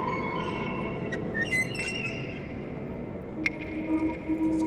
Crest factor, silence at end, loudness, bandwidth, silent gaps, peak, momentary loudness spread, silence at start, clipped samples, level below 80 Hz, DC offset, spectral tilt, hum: 18 dB; 0 s; -31 LUFS; 12.5 kHz; none; -12 dBFS; 10 LU; 0 s; under 0.1%; -50 dBFS; under 0.1%; -5.5 dB/octave; none